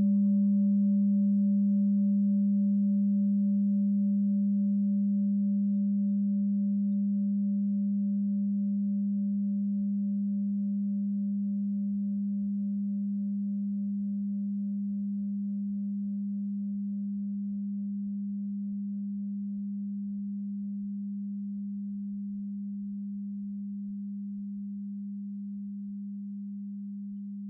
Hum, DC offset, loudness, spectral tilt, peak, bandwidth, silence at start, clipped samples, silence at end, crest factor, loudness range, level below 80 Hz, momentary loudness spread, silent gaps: none; under 0.1%; -31 LUFS; -22.5 dB/octave; -20 dBFS; 0.6 kHz; 0 s; under 0.1%; 0 s; 8 dB; 11 LU; -76 dBFS; 12 LU; none